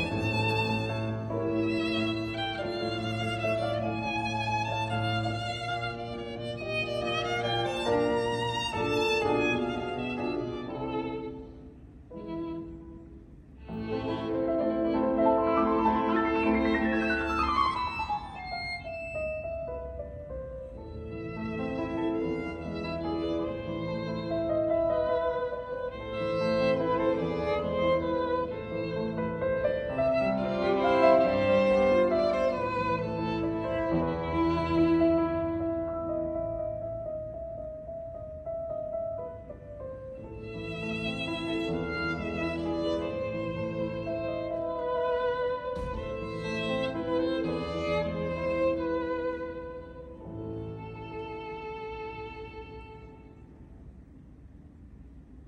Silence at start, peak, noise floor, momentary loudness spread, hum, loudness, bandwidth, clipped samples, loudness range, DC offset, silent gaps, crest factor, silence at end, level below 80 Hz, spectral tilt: 0 s; -10 dBFS; -51 dBFS; 14 LU; none; -30 LUFS; 11 kHz; under 0.1%; 11 LU; under 0.1%; none; 20 dB; 0 s; -50 dBFS; -6.5 dB/octave